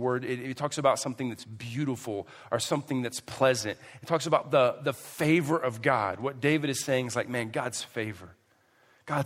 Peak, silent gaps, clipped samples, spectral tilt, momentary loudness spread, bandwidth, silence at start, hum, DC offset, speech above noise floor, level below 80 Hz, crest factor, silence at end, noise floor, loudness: -8 dBFS; none; under 0.1%; -4.5 dB/octave; 11 LU; 16 kHz; 0 s; none; under 0.1%; 36 dB; -70 dBFS; 22 dB; 0 s; -65 dBFS; -29 LUFS